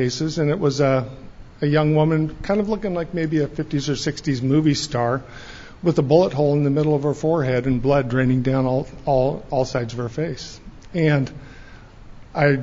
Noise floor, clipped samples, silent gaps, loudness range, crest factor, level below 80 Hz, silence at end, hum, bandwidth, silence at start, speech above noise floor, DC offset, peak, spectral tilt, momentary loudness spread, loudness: -41 dBFS; under 0.1%; none; 4 LU; 18 dB; -42 dBFS; 0 s; none; 7.6 kHz; 0 s; 21 dB; under 0.1%; -2 dBFS; -6.5 dB/octave; 10 LU; -21 LUFS